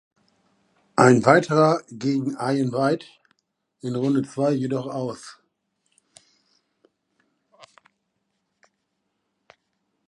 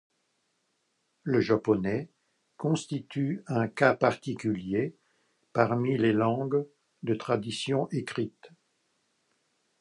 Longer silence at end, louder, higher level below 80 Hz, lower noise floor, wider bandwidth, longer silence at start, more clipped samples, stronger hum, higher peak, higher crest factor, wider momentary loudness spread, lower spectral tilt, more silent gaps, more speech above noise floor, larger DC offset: first, 4.75 s vs 1.35 s; first, -21 LUFS vs -29 LUFS; about the same, -68 dBFS vs -66 dBFS; about the same, -76 dBFS vs -76 dBFS; about the same, 11.5 kHz vs 11.5 kHz; second, 0.95 s vs 1.25 s; neither; neither; first, 0 dBFS vs -6 dBFS; about the same, 24 dB vs 24 dB; first, 14 LU vs 10 LU; about the same, -6.5 dB/octave vs -6.5 dB/octave; neither; first, 55 dB vs 48 dB; neither